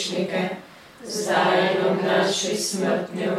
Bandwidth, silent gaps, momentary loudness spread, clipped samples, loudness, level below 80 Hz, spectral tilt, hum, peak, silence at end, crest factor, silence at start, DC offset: 15.5 kHz; none; 11 LU; under 0.1%; -22 LUFS; -68 dBFS; -3.5 dB/octave; none; -8 dBFS; 0 s; 16 dB; 0 s; under 0.1%